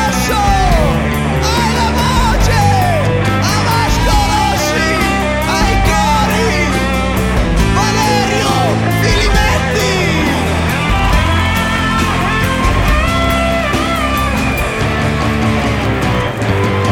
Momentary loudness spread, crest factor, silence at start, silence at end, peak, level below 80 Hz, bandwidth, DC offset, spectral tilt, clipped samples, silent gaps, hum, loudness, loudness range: 3 LU; 12 dB; 0 s; 0 s; 0 dBFS; -20 dBFS; 19 kHz; under 0.1%; -5 dB/octave; under 0.1%; none; none; -13 LUFS; 1 LU